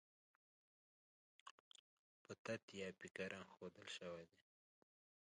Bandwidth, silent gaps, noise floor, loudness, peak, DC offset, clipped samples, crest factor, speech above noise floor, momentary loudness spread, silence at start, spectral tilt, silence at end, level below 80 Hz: 10 kHz; 1.51-1.71 s, 1.79-2.25 s, 2.39-2.45 s, 2.63-2.68 s; under -90 dBFS; -53 LUFS; -34 dBFS; under 0.1%; under 0.1%; 24 dB; over 37 dB; 18 LU; 1.45 s; -4 dB/octave; 0.95 s; -86 dBFS